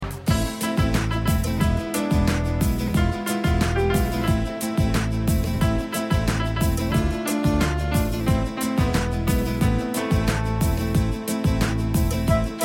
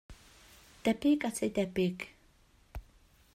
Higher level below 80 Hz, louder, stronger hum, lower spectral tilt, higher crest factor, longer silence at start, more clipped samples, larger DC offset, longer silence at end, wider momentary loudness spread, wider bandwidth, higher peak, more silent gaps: first, -28 dBFS vs -56 dBFS; first, -23 LUFS vs -32 LUFS; neither; about the same, -6 dB/octave vs -5.5 dB/octave; about the same, 16 dB vs 18 dB; about the same, 0 s vs 0.1 s; neither; neither; second, 0 s vs 0.55 s; second, 2 LU vs 22 LU; about the same, 17 kHz vs 15.5 kHz; first, -6 dBFS vs -16 dBFS; neither